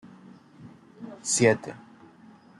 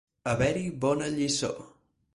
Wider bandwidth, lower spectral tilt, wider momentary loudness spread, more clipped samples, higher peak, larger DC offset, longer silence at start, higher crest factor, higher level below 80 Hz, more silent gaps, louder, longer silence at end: about the same, 12 kHz vs 11.5 kHz; about the same, -4 dB/octave vs -4.5 dB/octave; first, 24 LU vs 6 LU; neither; first, -8 dBFS vs -14 dBFS; neither; first, 0.6 s vs 0.25 s; first, 24 dB vs 16 dB; second, -68 dBFS vs -52 dBFS; neither; first, -24 LUFS vs -29 LUFS; first, 0.85 s vs 0.45 s